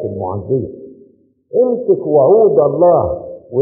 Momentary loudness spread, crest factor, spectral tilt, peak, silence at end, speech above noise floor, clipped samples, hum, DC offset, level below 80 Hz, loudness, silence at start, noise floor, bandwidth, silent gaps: 12 LU; 12 dB; -9.5 dB/octave; -2 dBFS; 0 s; 36 dB; under 0.1%; none; under 0.1%; -46 dBFS; -13 LUFS; 0 s; -48 dBFS; 1.9 kHz; none